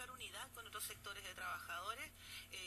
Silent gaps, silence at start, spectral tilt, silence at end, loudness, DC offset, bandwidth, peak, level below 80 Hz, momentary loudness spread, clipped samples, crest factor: none; 0 s; -1 dB/octave; 0 s; -48 LUFS; under 0.1%; 15.5 kHz; -34 dBFS; -70 dBFS; 5 LU; under 0.1%; 16 dB